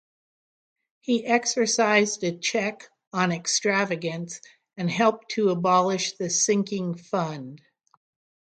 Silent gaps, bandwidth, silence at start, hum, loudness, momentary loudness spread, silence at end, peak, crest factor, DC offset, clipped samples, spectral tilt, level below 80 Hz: 3.07-3.11 s; 10 kHz; 1.1 s; none; -24 LUFS; 12 LU; 0.9 s; -6 dBFS; 20 dB; under 0.1%; under 0.1%; -3.5 dB/octave; -74 dBFS